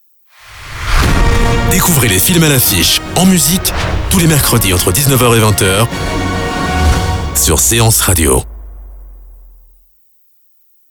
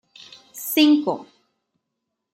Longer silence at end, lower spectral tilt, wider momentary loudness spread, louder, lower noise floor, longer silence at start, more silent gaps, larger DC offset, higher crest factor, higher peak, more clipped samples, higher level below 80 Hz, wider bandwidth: first, 1.6 s vs 1.1 s; about the same, -3.5 dB/octave vs -3 dB/octave; second, 8 LU vs 17 LU; first, -10 LUFS vs -19 LUFS; second, -50 dBFS vs -80 dBFS; about the same, 0.45 s vs 0.55 s; neither; neither; second, 12 dB vs 18 dB; first, 0 dBFS vs -6 dBFS; neither; first, -20 dBFS vs -80 dBFS; first, over 20 kHz vs 16 kHz